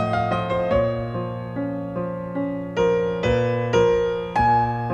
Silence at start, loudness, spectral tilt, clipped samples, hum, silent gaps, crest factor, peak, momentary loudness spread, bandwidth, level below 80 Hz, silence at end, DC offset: 0 s; -22 LUFS; -7 dB/octave; under 0.1%; none; none; 14 dB; -8 dBFS; 9 LU; 8.8 kHz; -42 dBFS; 0 s; under 0.1%